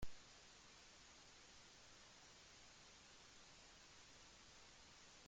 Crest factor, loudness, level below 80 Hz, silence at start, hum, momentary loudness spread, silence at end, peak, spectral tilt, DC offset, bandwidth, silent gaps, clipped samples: 24 dB; -63 LUFS; -70 dBFS; 0 s; none; 0 LU; 0 s; -36 dBFS; -2 dB/octave; under 0.1%; 16 kHz; none; under 0.1%